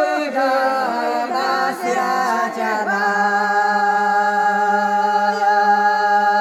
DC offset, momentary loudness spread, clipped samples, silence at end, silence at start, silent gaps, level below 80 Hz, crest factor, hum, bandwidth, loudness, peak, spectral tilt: under 0.1%; 5 LU; under 0.1%; 0 s; 0 s; none; -74 dBFS; 12 dB; none; 15 kHz; -17 LUFS; -4 dBFS; -3.5 dB/octave